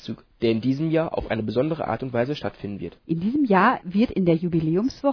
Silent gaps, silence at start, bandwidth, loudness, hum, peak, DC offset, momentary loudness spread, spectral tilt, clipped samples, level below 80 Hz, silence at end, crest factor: none; 0 s; 5.4 kHz; -23 LUFS; none; -6 dBFS; under 0.1%; 11 LU; -8 dB/octave; under 0.1%; -50 dBFS; 0 s; 16 dB